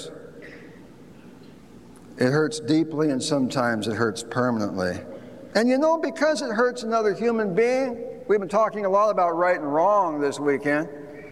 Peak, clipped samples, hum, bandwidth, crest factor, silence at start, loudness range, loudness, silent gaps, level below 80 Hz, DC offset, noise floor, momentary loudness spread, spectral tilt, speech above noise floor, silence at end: -6 dBFS; under 0.1%; none; 13.5 kHz; 18 dB; 0 s; 3 LU; -23 LUFS; none; -64 dBFS; 0.2%; -47 dBFS; 14 LU; -5.5 dB/octave; 24 dB; 0 s